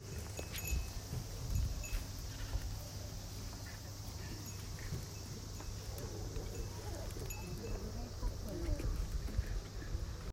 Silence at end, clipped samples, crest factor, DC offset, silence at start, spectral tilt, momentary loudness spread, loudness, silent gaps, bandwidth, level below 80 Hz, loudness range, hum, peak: 0 s; under 0.1%; 18 dB; under 0.1%; 0 s; -4.5 dB/octave; 6 LU; -44 LUFS; none; 16 kHz; -44 dBFS; 3 LU; none; -24 dBFS